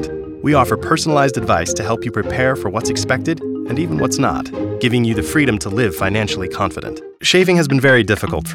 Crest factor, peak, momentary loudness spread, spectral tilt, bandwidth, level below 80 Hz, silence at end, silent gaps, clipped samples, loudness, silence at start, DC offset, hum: 14 dB; -2 dBFS; 9 LU; -5 dB/octave; 17 kHz; -40 dBFS; 0 s; none; under 0.1%; -16 LUFS; 0 s; under 0.1%; none